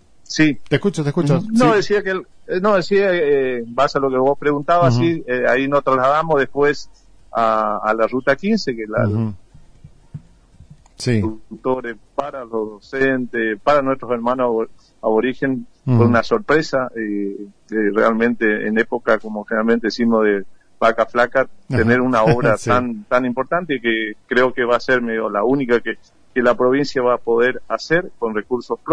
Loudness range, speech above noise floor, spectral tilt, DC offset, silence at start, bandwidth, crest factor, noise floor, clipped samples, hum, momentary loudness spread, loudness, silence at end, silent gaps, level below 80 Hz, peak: 6 LU; 29 dB; -6.5 dB/octave; under 0.1%; 0.3 s; 10.5 kHz; 16 dB; -47 dBFS; under 0.1%; none; 10 LU; -18 LUFS; 0 s; none; -48 dBFS; -2 dBFS